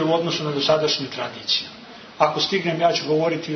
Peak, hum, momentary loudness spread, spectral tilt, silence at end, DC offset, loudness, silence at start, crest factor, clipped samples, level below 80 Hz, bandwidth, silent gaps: -6 dBFS; none; 9 LU; -4.5 dB/octave; 0 s; under 0.1%; -21 LUFS; 0 s; 16 dB; under 0.1%; -62 dBFS; 6.6 kHz; none